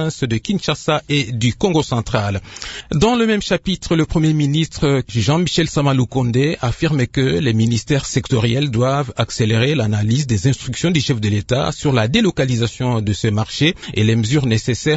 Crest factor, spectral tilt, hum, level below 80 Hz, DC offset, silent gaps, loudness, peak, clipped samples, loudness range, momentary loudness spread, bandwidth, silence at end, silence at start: 16 dB; -5.5 dB/octave; none; -38 dBFS; under 0.1%; none; -17 LUFS; 0 dBFS; under 0.1%; 1 LU; 4 LU; 8 kHz; 0 s; 0 s